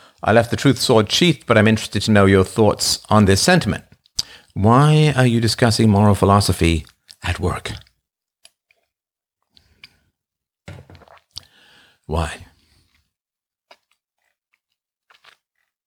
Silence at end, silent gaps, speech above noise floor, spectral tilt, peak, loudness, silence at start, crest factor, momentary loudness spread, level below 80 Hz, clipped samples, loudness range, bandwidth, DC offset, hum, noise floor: 3.45 s; none; over 75 dB; -5 dB/octave; -2 dBFS; -16 LUFS; 0.25 s; 18 dB; 15 LU; -40 dBFS; under 0.1%; 18 LU; 18.5 kHz; under 0.1%; none; under -90 dBFS